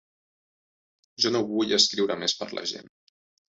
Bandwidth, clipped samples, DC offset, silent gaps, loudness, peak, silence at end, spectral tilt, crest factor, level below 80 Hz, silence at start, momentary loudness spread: 8.4 kHz; under 0.1%; under 0.1%; none; -24 LUFS; -4 dBFS; 0.65 s; -2.5 dB/octave; 24 dB; -70 dBFS; 1.2 s; 12 LU